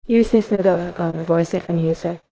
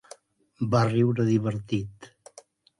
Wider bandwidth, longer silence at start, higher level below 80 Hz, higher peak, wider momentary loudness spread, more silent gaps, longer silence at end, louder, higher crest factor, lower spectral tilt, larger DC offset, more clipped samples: second, 8 kHz vs 11 kHz; second, 0.05 s vs 0.6 s; first, -44 dBFS vs -58 dBFS; first, -2 dBFS vs -10 dBFS; about the same, 8 LU vs 10 LU; neither; second, 0.15 s vs 0.75 s; first, -19 LUFS vs -25 LUFS; about the same, 16 dB vs 16 dB; about the same, -8 dB/octave vs -7.5 dB/octave; neither; neither